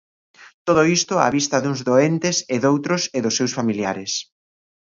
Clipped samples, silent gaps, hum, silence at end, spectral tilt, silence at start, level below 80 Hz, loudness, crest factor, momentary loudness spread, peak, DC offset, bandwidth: under 0.1%; 0.54-0.65 s; none; 0.65 s; -4 dB/octave; 0.4 s; -60 dBFS; -20 LUFS; 20 dB; 7 LU; -2 dBFS; under 0.1%; 7.6 kHz